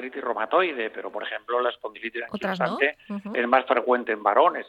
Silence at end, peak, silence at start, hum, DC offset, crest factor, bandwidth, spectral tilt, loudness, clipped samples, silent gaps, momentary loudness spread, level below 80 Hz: 0 s; -6 dBFS; 0 s; none; under 0.1%; 20 dB; 8 kHz; -6.5 dB/octave; -25 LUFS; under 0.1%; none; 11 LU; -72 dBFS